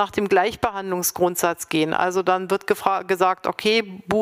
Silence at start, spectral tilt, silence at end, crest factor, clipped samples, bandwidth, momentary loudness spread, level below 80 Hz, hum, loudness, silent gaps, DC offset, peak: 0 s; -3.5 dB/octave; 0 s; 18 dB; under 0.1%; 16 kHz; 4 LU; -56 dBFS; none; -21 LUFS; none; under 0.1%; -4 dBFS